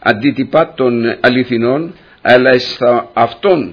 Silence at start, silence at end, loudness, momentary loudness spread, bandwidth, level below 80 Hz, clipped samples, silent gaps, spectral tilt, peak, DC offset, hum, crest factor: 0.05 s; 0 s; -12 LUFS; 7 LU; 5.4 kHz; -52 dBFS; 0.2%; none; -7 dB/octave; 0 dBFS; under 0.1%; none; 12 dB